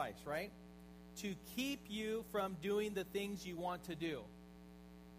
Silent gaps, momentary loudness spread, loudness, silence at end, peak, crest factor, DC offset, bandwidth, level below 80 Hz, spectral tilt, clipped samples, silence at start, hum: none; 19 LU; -43 LUFS; 0 s; -26 dBFS; 18 dB; under 0.1%; 15.5 kHz; -66 dBFS; -4.5 dB/octave; under 0.1%; 0 s; none